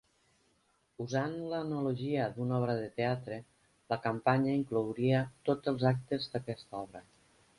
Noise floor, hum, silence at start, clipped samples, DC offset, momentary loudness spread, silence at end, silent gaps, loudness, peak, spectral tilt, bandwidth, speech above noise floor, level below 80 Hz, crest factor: -73 dBFS; none; 1 s; under 0.1%; under 0.1%; 13 LU; 0.55 s; none; -34 LUFS; -14 dBFS; -7.5 dB/octave; 11.5 kHz; 40 dB; -68 dBFS; 20 dB